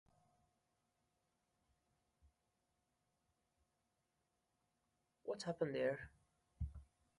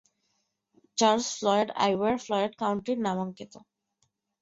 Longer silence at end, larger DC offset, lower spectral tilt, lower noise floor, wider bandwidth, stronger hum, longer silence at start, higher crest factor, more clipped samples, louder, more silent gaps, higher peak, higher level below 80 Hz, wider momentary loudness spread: second, 0.35 s vs 0.85 s; neither; first, -6 dB/octave vs -4 dB/octave; first, -87 dBFS vs -77 dBFS; first, 11 kHz vs 8 kHz; neither; first, 5.25 s vs 0.95 s; about the same, 24 dB vs 20 dB; neither; second, -45 LUFS vs -27 LUFS; neither; second, -26 dBFS vs -8 dBFS; about the same, -64 dBFS vs -68 dBFS; first, 16 LU vs 12 LU